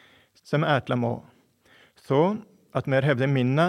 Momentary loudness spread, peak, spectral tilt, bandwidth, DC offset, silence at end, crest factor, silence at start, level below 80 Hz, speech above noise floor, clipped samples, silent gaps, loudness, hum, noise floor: 9 LU; -6 dBFS; -8 dB/octave; 10 kHz; under 0.1%; 0 s; 18 dB; 0.5 s; -68 dBFS; 36 dB; under 0.1%; none; -25 LUFS; none; -59 dBFS